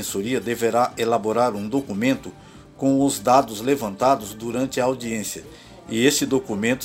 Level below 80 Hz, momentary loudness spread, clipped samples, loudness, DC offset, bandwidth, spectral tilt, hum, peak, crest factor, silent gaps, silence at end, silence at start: -54 dBFS; 10 LU; under 0.1%; -22 LUFS; under 0.1%; 16 kHz; -4.5 dB/octave; none; -2 dBFS; 20 dB; none; 0 s; 0 s